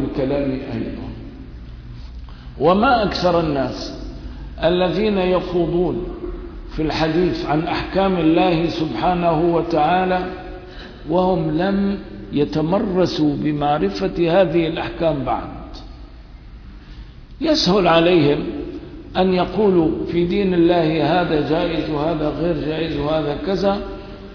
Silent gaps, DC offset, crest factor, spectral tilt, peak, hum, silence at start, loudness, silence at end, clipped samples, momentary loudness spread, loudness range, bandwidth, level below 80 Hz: none; under 0.1%; 14 dB; -7 dB/octave; -4 dBFS; none; 0 s; -19 LUFS; 0 s; under 0.1%; 18 LU; 3 LU; 5.4 kHz; -36 dBFS